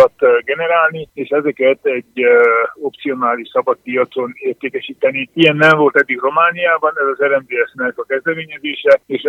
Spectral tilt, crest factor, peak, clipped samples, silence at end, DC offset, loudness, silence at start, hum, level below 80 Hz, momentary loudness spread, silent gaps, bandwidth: -6.5 dB/octave; 14 dB; 0 dBFS; under 0.1%; 0 s; under 0.1%; -15 LUFS; 0 s; none; -64 dBFS; 11 LU; none; 7.8 kHz